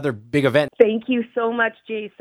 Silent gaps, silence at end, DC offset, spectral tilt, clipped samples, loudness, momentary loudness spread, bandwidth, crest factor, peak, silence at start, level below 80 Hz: none; 0.1 s; under 0.1%; -7 dB/octave; under 0.1%; -20 LUFS; 7 LU; 13.5 kHz; 20 dB; 0 dBFS; 0 s; -62 dBFS